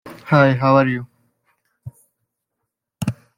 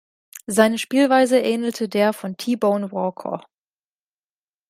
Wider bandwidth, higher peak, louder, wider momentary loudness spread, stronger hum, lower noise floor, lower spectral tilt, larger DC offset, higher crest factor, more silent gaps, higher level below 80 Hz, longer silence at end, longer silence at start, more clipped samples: about the same, 15.5 kHz vs 16 kHz; about the same, -2 dBFS vs -2 dBFS; first, -17 LUFS vs -20 LUFS; about the same, 14 LU vs 14 LU; second, none vs 50 Hz at -45 dBFS; second, -79 dBFS vs under -90 dBFS; first, -7.5 dB/octave vs -4.5 dB/octave; neither; about the same, 18 dB vs 20 dB; neither; first, -56 dBFS vs -70 dBFS; second, 0.25 s vs 1.3 s; second, 0.05 s vs 0.35 s; neither